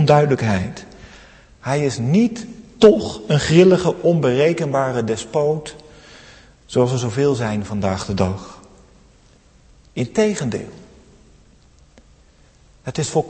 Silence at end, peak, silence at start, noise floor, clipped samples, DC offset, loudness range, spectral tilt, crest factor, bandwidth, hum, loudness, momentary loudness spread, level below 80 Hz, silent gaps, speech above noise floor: 0 s; 0 dBFS; 0 s; -51 dBFS; under 0.1%; under 0.1%; 10 LU; -6 dB/octave; 20 dB; 8.8 kHz; none; -18 LUFS; 19 LU; -48 dBFS; none; 34 dB